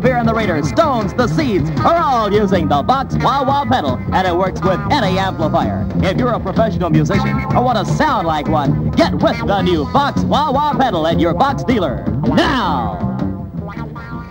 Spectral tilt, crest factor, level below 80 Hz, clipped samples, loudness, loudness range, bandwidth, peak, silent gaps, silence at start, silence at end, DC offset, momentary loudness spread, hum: -7 dB/octave; 14 dB; -32 dBFS; under 0.1%; -15 LUFS; 1 LU; 16.5 kHz; 0 dBFS; none; 0 s; 0 s; under 0.1%; 4 LU; none